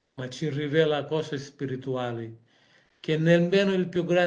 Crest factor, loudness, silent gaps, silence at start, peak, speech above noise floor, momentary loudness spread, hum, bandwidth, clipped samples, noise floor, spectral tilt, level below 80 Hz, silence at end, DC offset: 18 dB; -26 LUFS; none; 0.15 s; -8 dBFS; 37 dB; 15 LU; none; 9 kHz; under 0.1%; -62 dBFS; -6.5 dB/octave; -68 dBFS; 0 s; under 0.1%